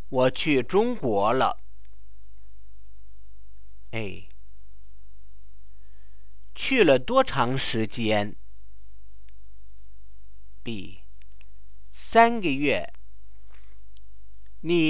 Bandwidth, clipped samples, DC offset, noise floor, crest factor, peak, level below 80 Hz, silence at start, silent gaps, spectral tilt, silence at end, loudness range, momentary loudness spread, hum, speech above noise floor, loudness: 4 kHz; under 0.1%; 4%; -52 dBFS; 24 dB; -4 dBFS; -50 dBFS; 0.1 s; none; -9.5 dB/octave; 0 s; 17 LU; 19 LU; none; 28 dB; -24 LUFS